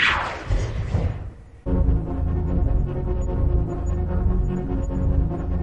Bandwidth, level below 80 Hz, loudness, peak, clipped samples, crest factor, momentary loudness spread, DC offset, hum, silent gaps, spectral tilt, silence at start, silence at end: 8.2 kHz; -24 dBFS; -25 LUFS; -6 dBFS; under 0.1%; 16 dB; 4 LU; 0.4%; none; none; -7 dB/octave; 0 s; 0 s